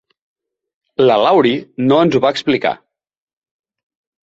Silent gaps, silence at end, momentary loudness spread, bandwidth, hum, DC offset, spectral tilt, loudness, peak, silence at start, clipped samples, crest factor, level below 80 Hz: none; 1.45 s; 9 LU; 7.8 kHz; none; under 0.1%; -6.5 dB/octave; -14 LUFS; -2 dBFS; 1 s; under 0.1%; 16 dB; -58 dBFS